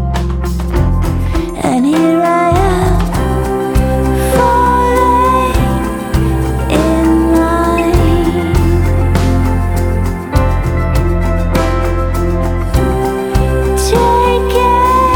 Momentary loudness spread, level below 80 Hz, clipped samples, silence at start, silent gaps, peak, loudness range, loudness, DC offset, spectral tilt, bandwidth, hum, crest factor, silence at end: 5 LU; -16 dBFS; under 0.1%; 0 s; none; 0 dBFS; 3 LU; -12 LUFS; under 0.1%; -6.5 dB/octave; 18.5 kHz; none; 12 dB; 0 s